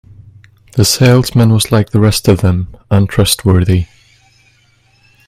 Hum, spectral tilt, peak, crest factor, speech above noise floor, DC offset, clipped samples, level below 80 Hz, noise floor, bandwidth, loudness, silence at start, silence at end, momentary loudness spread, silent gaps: none; -5.5 dB/octave; 0 dBFS; 12 dB; 41 dB; under 0.1%; under 0.1%; -36 dBFS; -51 dBFS; 16 kHz; -11 LUFS; 0.75 s; 1.45 s; 7 LU; none